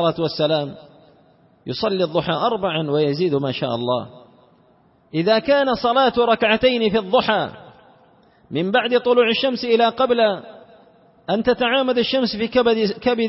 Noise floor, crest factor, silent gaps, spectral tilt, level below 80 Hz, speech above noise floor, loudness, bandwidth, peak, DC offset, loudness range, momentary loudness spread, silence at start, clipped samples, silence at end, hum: -56 dBFS; 18 dB; none; -9 dB/octave; -54 dBFS; 37 dB; -19 LUFS; 5.8 kHz; -2 dBFS; under 0.1%; 4 LU; 9 LU; 0 s; under 0.1%; 0 s; none